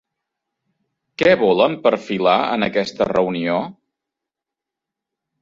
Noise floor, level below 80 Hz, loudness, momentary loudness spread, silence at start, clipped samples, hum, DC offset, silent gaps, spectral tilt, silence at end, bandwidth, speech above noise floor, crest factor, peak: -85 dBFS; -56 dBFS; -18 LUFS; 7 LU; 1.2 s; under 0.1%; none; under 0.1%; none; -6 dB/octave; 1.7 s; 7.6 kHz; 68 dB; 20 dB; 0 dBFS